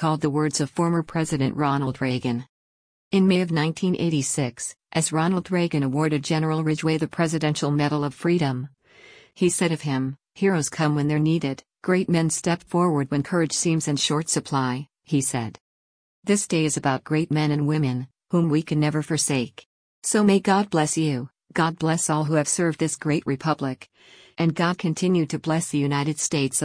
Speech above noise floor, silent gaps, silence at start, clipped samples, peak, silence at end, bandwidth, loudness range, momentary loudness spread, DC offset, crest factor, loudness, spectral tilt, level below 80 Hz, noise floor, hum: 28 dB; 2.49-3.11 s, 15.60-16.22 s, 19.66-20.02 s; 0 s; under 0.1%; -8 dBFS; 0 s; 10.5 kHz; 2 LU; 6 LU; under 0.1%; 16 dB; -23 LUFS; -5 dB/octave; -60 dBFS; -51 dBFS; none